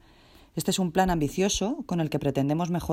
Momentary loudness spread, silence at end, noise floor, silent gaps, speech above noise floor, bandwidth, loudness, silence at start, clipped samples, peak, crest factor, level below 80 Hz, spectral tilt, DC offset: 5 LU; 0 s; -55 dBFS; none; 29 dB; 16 kHz; -27 LUFS; 0.55 s; under 0.1%; -8 dBFS; 18 dB; -46 dBFS; -5 dB/octave; under 0.1%